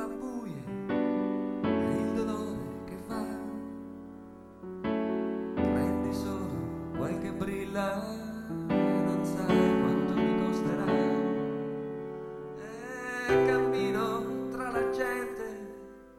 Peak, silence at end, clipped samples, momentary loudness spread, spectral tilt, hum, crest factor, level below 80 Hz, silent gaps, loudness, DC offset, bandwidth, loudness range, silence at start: -14 dBFS; 0 s; under 0.1%; 14 LU; -7 dB/octave; none; 18 dB; -54 dBFS; none; -31 LUFS; under 0.1%; 15.5 kHz; 6 LU; 0 s